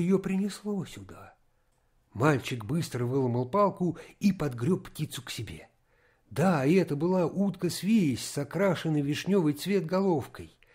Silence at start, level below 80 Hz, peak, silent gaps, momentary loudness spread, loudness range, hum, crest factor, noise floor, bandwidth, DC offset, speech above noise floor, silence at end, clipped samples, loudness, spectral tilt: 0 s; -60 dBFS; -10 dBFS; none; 13 LU; 4 LU; none; 18 dB; -69 dBFS; 16 kHz; under 0.1%; 41 dB; 0.25 s; under 0.1%; -29 LUFS; -6.5 dB/octave